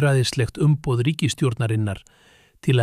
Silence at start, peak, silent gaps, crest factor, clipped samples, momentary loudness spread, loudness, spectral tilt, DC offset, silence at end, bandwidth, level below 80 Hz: 0 s; -8 dBFS; none; 14 dB; under 0.1%; 8 LU; -22 LUFS; -6 dB/octave; under 0.1%; 0 s; 13.5 kHz; -50 dBFS